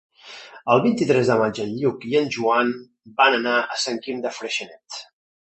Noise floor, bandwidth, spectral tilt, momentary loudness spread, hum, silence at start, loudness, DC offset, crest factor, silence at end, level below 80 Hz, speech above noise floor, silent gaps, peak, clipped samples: -42 dBFS; 8.4 kHz; -4.5 dB/octave; 18 LU; none; 0.25 s; -21 LUFS; under 0.1%; 22 dB; 0.45 s; -64 dBFS; 21 dB; none; -2 dBFS; under 0.1%